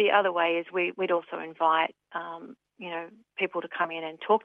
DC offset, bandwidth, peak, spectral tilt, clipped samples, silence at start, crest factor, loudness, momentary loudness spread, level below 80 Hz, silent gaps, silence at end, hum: under 0.1%; 5.4 kHz; -10 dBFS; -7 dB/octave; under 0.1%; 0 s; 18 dB; -29 LUFS; 16 LU; -84 dBFS; none; 0.05 s; none